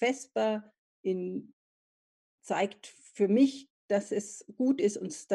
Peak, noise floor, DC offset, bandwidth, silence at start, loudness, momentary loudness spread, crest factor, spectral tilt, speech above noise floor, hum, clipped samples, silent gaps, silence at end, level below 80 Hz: -14 dBFS; under -90 dBFS; under 0.1%; 11.5 kHz; 0 s; -31 LUFS; 16 LU; 18 dB; -5 dB/octave; over 60 dB; none; under 0.1%; 0.79-1.04 s, 1.53-2.38 s, 3.70-3.89 s; 0 s; -82 dBFS